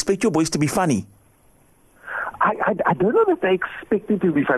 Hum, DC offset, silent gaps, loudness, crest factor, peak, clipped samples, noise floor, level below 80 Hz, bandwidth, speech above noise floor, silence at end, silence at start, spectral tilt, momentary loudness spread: none; under 0.1%; none; -21 LUFS; 16 dB; -6 dBFS; under 0.1%; -55 dBFS; -54 dBFS; 13 kHz; 36 dB; 0 s; 0 s; -5.5 dB/octave; 7 LU